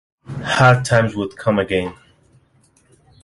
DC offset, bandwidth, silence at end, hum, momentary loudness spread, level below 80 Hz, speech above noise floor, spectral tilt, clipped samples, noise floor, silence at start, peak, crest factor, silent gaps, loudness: under 0.1%; 11.5 kHz; 1.3 s; none; 16 LU; -46 dBFS; 41 dB; -5.5 dB/octave; under 0.1%; -57 dBFS; 0.3 s; -2 dBFS; 18 dB; none; -17 LUFS